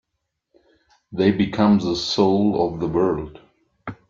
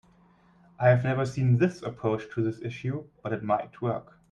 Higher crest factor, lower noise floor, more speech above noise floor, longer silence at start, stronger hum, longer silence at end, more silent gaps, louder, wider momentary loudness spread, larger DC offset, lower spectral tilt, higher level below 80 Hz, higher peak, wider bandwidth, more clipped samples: about the same, 18 dB vs 18 dB; first, -78 dBFS vs -60 dBFS; first, 59 dB vs 33 dB; first, 1.1 s vs 0.8 s; neither; second, 0.15 s vs 0.3 s; neither; first, -20 LUFS vs -28 LUFS; first, 18 LU vs 11 LU; neither; second, -6.5 dB/octave vs -8.5 dB/octave; first, -50 dBFS vs -62 dBFS; first, -4 dBFS vs -8 dBFS; second, 7.4 kHz vs 8.8 kHz; neither